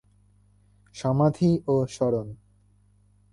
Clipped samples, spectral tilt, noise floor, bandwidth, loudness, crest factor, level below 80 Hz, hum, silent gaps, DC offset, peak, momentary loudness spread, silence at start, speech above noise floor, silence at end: under 0.1%; -8 dB/octave; -61 dBFS; 11 kHz; -25 LUFS; 16 dB; -56 dBFS; 50 Hz at -50 dBFS; none; under 0.1%; -10 dBFS; 14 LU; 0.95 s; 37 dB; 1 s